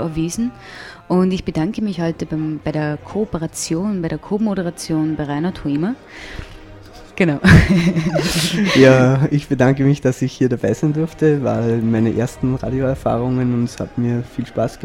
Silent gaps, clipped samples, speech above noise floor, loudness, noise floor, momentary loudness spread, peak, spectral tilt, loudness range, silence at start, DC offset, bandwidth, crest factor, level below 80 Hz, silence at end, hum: none; under 0.1%; 21 dB; -17 LUFS; -38 dBFS; 12 LU; 0 dBFS; -6.5 dB/octave; 8 LU; 0 s; under 0.1%; 16.5 kHz; 18 dB; -36 dBFS; 0 s; none